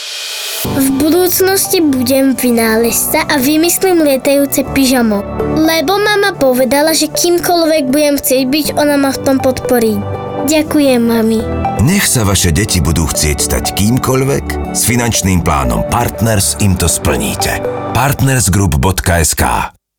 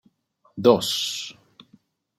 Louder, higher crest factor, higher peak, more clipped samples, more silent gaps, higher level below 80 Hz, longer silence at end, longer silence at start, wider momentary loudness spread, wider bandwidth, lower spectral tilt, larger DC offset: first, -11 LUFS vs -22 LUFS; second, 10 dB vs 22 dB; about the same, 0 dBFS vs -2 dBFS; neither; neither; first, -28 dBFS vs -68 dBFS; second, 0.3 s vs 0.85 s; second, 0 s vs 0.55 s; second, 5 LU vs 19 LU; first, over 20 kHz vs 16 kHz; about the same, -4 dB/octave vs -4 dB/octave; neither